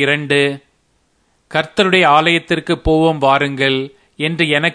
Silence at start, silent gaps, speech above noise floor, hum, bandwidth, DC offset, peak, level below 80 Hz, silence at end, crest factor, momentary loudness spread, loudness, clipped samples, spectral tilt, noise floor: 0 s; none; 46 dB; none; 10.5 kHz; under 0.1%; 0 dBFS; -36 dBFS; 0 s; 16 dB; 10 LU; -14 LUFS; under 0.1%; -5 dB/octave; -60 dBFS